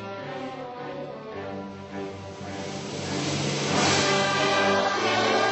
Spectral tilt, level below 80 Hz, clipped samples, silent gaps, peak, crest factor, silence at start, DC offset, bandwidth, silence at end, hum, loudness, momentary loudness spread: -3.5 dB/octave; -64 dBFS; under 0.1%; none; -10 dBFS; 16 dB; 0 s; under 0.1%; 8.4 kHz; 0 s; none; -25 LUFS; 15 LU